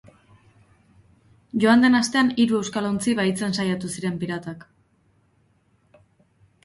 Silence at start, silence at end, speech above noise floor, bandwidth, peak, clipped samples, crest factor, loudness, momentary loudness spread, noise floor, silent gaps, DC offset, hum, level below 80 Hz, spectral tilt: 1.55 s; 2.05 s; 42 dB; 11.5 kHz; -4 dBFS; under 0.1%; 20 dB; -22 LUFS; 14 LU; -63 dBFS; none; under 0.1%; none; -62 dBFS; -5 dB/octave